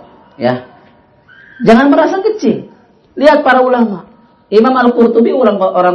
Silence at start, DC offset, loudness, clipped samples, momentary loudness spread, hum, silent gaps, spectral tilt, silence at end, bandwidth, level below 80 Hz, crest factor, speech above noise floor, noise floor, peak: 0.4 s; under 0.1%; -10 LUFS; 1%; 10 LU; none; none; -6.5 dB/octave; 0 s; 8.6 kHz; -50 dBFS; 12 dB; 36 dB; -45 dBFS; 0 dBFS